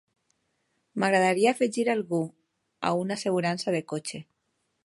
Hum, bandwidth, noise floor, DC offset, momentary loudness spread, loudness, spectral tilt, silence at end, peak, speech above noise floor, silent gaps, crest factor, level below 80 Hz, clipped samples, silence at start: none; 11.5 kHz; -76 dBFS; under 0.1%; 13 LU; -27 LUFS; -5 dB/octave; 0.65 s; -8 dBFS; 50 dB; none; 20 dB; -74 dBFS; under 0.1%; 0.95 s